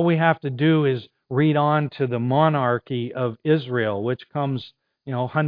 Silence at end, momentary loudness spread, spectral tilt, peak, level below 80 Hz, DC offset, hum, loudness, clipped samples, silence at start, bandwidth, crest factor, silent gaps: 0 s; 9 LU; -10.5 dB/octave; -2 dBFS; -66 dBFS; under 0.1%; none; -22 LUFS; under 0.1%; 0 s; 5.2 kHz; 18 dB; none